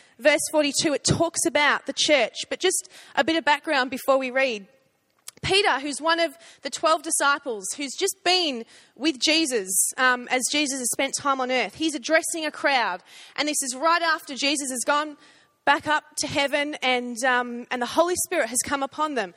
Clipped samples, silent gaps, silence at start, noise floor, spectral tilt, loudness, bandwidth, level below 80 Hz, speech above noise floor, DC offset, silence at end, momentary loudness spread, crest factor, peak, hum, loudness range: under 0.1%; none; 0.2 s; -66 dBFS; -2 dB/octave; -23 LUFS; 16 kHz; -60 dBFS; 42 dB; under 0.1%; 0.05 s; 8 LU; 20 dB; -4 dBFS; none; 2 LU